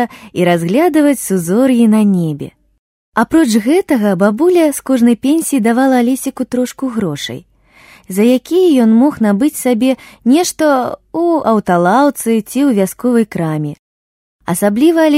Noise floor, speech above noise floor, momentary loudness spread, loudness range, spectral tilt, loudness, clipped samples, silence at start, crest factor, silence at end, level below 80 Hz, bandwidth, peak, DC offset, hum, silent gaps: -44 dBFS; 32 dB; 9 LU; 2 LU; -5.5 dB/octave; -13 LUFS; under 0.1%; 0 s; 12 dB; 0 s; -52 dBFS; 16 kHz; 0 dBFS; under 0.1%; none; 2.79-3.12 s, 13.79-14.39 s